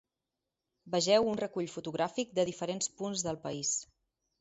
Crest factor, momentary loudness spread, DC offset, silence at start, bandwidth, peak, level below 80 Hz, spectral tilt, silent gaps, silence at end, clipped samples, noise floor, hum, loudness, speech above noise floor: 20 dB; 9 LU; under 0.1%; 0.85 s; 8.2 kHz; -14 dBFS; -70 dBFS; -3.5 dB/octave; none; 0.55 s; under 0.1%; -89 dBFS; none; -33 LUFS; 56 dB